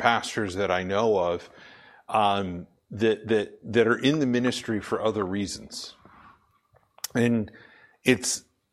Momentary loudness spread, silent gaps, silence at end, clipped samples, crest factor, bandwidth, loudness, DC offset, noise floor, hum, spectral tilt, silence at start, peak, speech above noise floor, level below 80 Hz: 15 LU; none; 0.3 s; under 0.1%; 24 dB; 16 kHz; -26 LUFS; under 0.1%; -64 dBFS; none; -4.5 dB/octave; 0 s; -4 dBFS; 39 dB; -60 dBFS